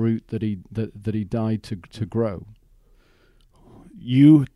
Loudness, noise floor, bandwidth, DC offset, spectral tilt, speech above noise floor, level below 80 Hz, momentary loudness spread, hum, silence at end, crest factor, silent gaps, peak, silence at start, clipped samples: -22 LUFS; -57 dBFS; 11 kHz; under 0.1%; -9 dB/octave; 36 dB; -52 dBFS; 18 LU; none; 0.1 s; 18 dB; none; -4 dBFS; 0 s; under 0.1%